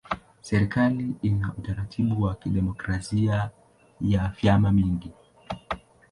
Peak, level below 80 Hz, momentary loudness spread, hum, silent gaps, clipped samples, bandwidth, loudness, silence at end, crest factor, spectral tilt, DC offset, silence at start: -8 dBFS; -42 dBFS; 13 LU; none; none; under 0.1%; 11 kHz; -26 LUFS; 0.35 s; 18 dB; -7.5 dB/octave; under 0.1%; 0.1 s